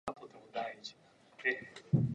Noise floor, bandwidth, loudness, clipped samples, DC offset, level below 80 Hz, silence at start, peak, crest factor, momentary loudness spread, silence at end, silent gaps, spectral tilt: -62 dBFS; 9.6 kHz; -38 LUFS; under 0.1%; under 0.1%; -66 dBFS; 0.05 s; -16 dBFS; 22 dB; 15 LU; 0 s; none; -7 dB/octave